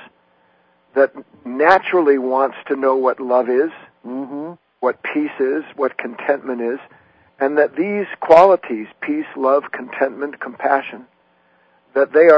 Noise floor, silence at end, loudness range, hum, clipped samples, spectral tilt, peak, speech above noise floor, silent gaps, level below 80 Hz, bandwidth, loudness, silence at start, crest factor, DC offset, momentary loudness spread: -58 dBFS; 0 s; 6 LU; none; 0.1%; -7 dB/octave; 0 dBFS; 41 dB; none; -66 dBFS; 8 kHz; -18 LUFS; 0 s; 18 dB; under 0.1%; 15 LU